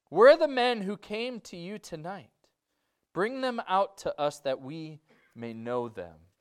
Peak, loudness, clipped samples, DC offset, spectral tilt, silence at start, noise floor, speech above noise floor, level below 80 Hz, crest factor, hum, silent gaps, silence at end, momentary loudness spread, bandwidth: -8 dBFS; -27 LUFS; under 0.1%; under 0.1%; -5 dB/octave; 0.1 s; -80 dBFS; 52 dB; -70 dBFS; 22 dB; none; none; 0.3 s; 20 LU; 13 kHz